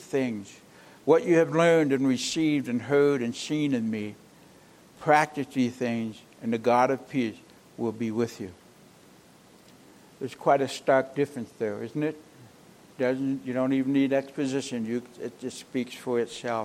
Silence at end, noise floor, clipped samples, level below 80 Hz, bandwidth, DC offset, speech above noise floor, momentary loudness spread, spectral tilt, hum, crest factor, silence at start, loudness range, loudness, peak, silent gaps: 0 s; -55 dBFS; under 0.1%; -72 dBFS; 14.5 kHz; under 0.1%; 29 dB; 13 LU; -5.5 dB/octave; none; 22 dB; 0 s; 5 LU; -27 LUFS; -6 dBFS; none